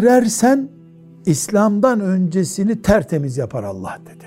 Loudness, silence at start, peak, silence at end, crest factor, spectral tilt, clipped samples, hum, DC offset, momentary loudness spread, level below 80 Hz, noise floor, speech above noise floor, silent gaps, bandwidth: -17 LUFS; 0 s; -2 dBFS; 0 s; 16 dB; -6 dB/octave; under 0.1%; none; under 0.1%; 12 LU; -42 dBFS; -42 dBFS; 26 dB; none; 16 kHz